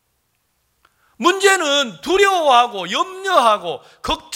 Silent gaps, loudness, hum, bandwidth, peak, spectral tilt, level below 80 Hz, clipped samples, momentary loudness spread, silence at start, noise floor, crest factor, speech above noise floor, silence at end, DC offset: none; -16 LUFS; none; 17 kHz; 0 dBFS; -1.5 dB/octave; -48 dBFS; under 0.1%; 10 LU; 1.2 s; -67 dBFS; 18 dB; 50 dB; 0 s; under 0.1%